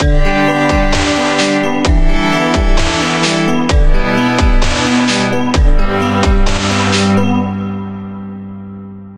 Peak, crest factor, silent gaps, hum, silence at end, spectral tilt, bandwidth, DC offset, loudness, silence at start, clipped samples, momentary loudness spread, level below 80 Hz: 0 dBFS; 12 dB; none; none; 0 s; -5 dB/octave; 11 kHz; under 0.1%; -13 LUFS; 0 s; under 0.1%; 13 LU; -14 dBFS